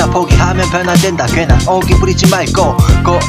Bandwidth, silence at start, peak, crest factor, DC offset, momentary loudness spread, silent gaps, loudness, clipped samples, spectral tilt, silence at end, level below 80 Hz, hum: 16 kHz; 0 s; 0 dBFS; 10 dB; under 0.1%; 2 LU; none; -10 LUFS; 0.4%; -5.5 dB/octave; 0 s; -18 dBFS; none